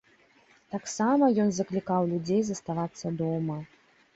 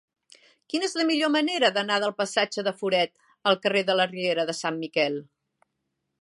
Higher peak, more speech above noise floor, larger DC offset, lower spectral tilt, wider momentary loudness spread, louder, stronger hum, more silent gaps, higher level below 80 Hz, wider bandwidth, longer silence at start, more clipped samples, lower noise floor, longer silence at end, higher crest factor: second, -12 dBFS vs -8 dBFS; second, 34 dB vs 55 dB; neither; first, -6.5 dB/octave vs -3.5 dB/octave; first, 12 LU vs 6 LU; second, -28 LUFS vs -25 LUFS; neither; neither; first, -66 dBFS vs -80 dBFS; second, 8.2 kHz vs 11.5 kHz; about the same, 0.7 s vs 0.75 s; neither; second, -61 dBFS vs -80 dBFS; second, 0.5 s vs 1 s; about the same, 16 dB vs 20 dB